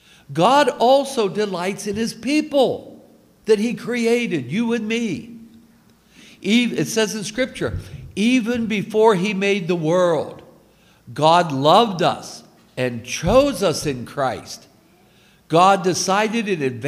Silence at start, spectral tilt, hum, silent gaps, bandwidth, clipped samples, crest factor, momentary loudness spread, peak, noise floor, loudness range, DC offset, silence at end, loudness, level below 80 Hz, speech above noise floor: 0.3 s; -4.5 dB/octave; none; none; 15.5 kHz; under 0.1%; 20 dB; 15 LU; 0 dBFS; -53 dBFS; 4 LU; under 0.1%; 0 s; -19 LUFS; -48 dBFS; 35 dB